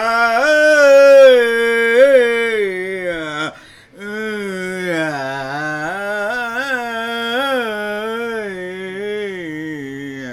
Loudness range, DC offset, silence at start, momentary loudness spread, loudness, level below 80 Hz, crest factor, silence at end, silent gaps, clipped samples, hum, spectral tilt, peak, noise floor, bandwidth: 11 LU; under 0.1%; 0 s; 17 LU; -15 LUFS; -56 dBFS; 16 dB; 0 s; none; under 0.1%; none; -4 dB/octave; 0 dBFS; -41 dBFS; 14 kHz